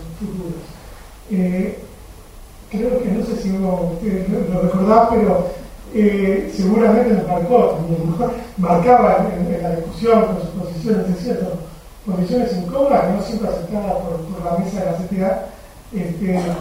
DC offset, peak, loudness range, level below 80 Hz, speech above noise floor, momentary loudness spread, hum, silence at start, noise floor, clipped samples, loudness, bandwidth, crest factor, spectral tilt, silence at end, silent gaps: under 0.1%; 0 dBFS; 7 LU; -38 dBFS; 21 dB; 13 LU; none; 0 s; -39 dBFS; under 0.1%; -18 LUFS; 16 kHz; 18 dB; -8 dB/octave; 0 s; none